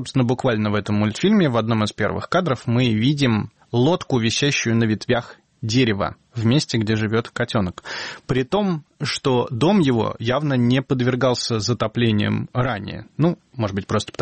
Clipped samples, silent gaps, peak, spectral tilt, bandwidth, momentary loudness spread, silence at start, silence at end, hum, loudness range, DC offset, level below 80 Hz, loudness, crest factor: under 0.1%; none; -8 dBFS; -6 dB/octave; 8.8 kHz; 7 LU; 0 s; 0.1 s; none; 2 LU; under 0.1%; -50 dBFS; -21 LUFS; 14 dB